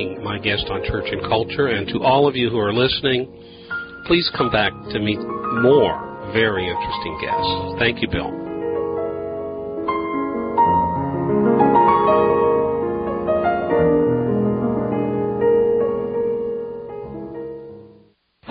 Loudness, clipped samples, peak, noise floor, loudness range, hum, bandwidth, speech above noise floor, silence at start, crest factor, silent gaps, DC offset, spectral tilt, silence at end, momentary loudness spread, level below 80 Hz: -19 LUFS; under 0.1%; -2 dBFS; -54 dBFS; 5 LU; none; 5.2 kHz; 34 dB; 0 s; 16 dB; none; under 0.1%; -11 dB/octave; 0 s; 12 LU; -42 dBFS